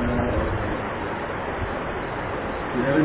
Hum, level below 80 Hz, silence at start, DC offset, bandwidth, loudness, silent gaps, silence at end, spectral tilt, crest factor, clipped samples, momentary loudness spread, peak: none; -36 dBFS; 0 s; under 0.1%; 4 kHz; -27 LUFS; none; 0 s; -11 dB/octave; 16 dB; under 0.1%; 5 LU; -8 dBFS